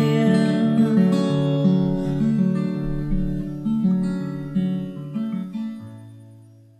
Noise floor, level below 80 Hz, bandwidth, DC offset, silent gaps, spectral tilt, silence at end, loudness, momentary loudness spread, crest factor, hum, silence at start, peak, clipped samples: -47 dBFS; -38 dBFS; 10 kHz; under 0.1%; none; -8.5 dB/octave; 0.4 s; -22 LUFS; 12 LU; 16 dB; none; 0 s; -6 dBFS; under 0.1%